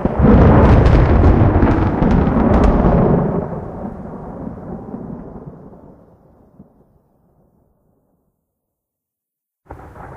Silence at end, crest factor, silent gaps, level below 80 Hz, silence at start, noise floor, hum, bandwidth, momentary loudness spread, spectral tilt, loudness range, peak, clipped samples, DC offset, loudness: 0 s; 16 dB; none; -22 dBFS; 0 s; -83 dBFS; none; 6.6 kHz; 21 LU; -10 dB/octave; 23 LU; 0 dBFS; under 0.1%; under 0.1%; -13 LUFS